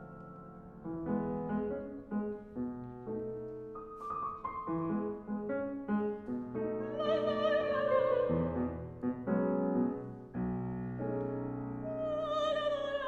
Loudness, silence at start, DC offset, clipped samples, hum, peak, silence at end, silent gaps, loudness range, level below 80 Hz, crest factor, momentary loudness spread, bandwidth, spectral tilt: -36 LUFS; 0 s; under 0.1%; under 0.1%; none; -18 dBFS; 0 s; none; 7 LU; -60 dBFS; 18 dB; 12 LU; 8 kHz; -8 dB/octave